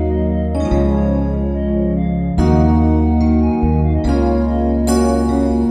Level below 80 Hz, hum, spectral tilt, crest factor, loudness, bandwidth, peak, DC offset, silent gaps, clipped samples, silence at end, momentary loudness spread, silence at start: -20 dBFS; none; -8 dB/octave; 12 dB; -16 LUFS; 12 kHz; -2 dBFS; under 0.1%; none; under 0.1%; 0 s; 5 LU; 0 s